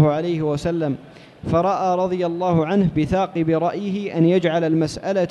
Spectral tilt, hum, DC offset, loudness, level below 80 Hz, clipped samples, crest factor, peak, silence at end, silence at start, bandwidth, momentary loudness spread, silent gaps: -7.5 dB/octave; none; under 0.1%; -20 LUFS; -46 dBFS; under 0.1%; 14 dB; -6 dBFS; 0 s; 0 s; 10.5 kHz; 6 LU; none